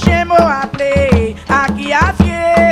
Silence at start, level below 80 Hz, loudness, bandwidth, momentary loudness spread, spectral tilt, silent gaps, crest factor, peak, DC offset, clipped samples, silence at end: 0 s; -24 dBFS; -12 LUFS; 12.5 kHz; 4 LU; -6.5 dB/octave; none; 12 dB; 0 dBFS; under 0.1%; 0.3%; 0 s